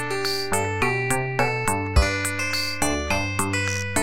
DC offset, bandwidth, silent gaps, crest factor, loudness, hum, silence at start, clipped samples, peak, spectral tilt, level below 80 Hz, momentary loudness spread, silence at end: 1%; 17 kHz; none; 18 dB; -23 LUFS; none; 0 s; under 0.1%; -4 dBFS; -3.5 dB/octave; -32 dBFS; 3 LU; 0 s